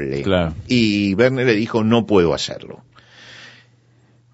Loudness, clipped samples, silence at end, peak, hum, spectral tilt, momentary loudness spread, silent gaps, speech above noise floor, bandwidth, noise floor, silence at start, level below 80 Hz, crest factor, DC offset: -17 LUFS; under 0.1%; 0.85 s; -2 dBFS; none; -6 dB/octave; 20 LU; none; 37 dB; 8 kHz; -54 dBFS; 0 s; -44 dBFS; 18 dB; under 0.1%